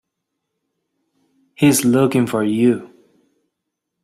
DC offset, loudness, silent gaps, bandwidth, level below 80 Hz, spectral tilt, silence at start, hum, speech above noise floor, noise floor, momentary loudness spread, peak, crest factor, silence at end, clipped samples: under 0.1%; -16 LUFS; none; 16 kHz; -58 dBFS; -5.5 dB/octave; 1.6 s; none; 63 dB; -78 dBFS; 4 LU; -2 dBFS; 18 dB; 1.2 s; under 0.1%